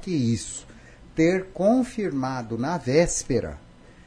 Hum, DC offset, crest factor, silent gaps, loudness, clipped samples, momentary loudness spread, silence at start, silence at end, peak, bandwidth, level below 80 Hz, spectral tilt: none; under 0.1%; 18 dB; none; -24 LUFS; under 0.1%; 13 LU; 0 s; 0.5 s; -6 dBFS; 10.5 kHz; -44 dBFS; -5.5 dB/octave